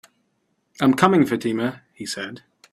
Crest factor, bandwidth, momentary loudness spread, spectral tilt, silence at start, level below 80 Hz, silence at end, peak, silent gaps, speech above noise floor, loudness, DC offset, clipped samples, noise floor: 22 dB; 15 kHz; 15 LU; -5.5 dB/octave; 0.8 s; -62 dBFS; 0.35 s; 0 dBFS; none; 50 dB; -21 LUFS; under 0.1%; under 0.1%; -70 dBFS